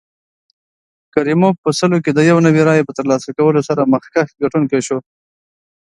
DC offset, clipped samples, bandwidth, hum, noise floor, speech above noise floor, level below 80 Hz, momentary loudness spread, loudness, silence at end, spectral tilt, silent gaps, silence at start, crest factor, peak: under 0.1%; under 0.1%; 11.5 kHz; none; under -90 dBFS; over 76 dB; -58 dBFS; 8 LU; -14 LUFS; 0.85 s; -6.5 dB/octave; 1.58-1.63 s; 1.15 s; 16 dB; 0 dBFS